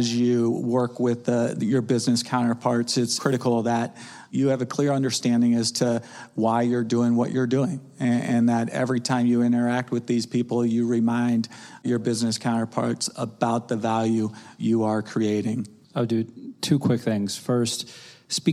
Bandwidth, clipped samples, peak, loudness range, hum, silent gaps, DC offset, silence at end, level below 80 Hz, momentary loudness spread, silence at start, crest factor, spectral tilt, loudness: 14 kHz; under 0.1%; -8 dBFS; 3 LU; none; none; under 0.1%; 0 s; -72 dBFS; 7 LU; 0 s; 16 dB; -5.5 dB/octave; -24 LUFS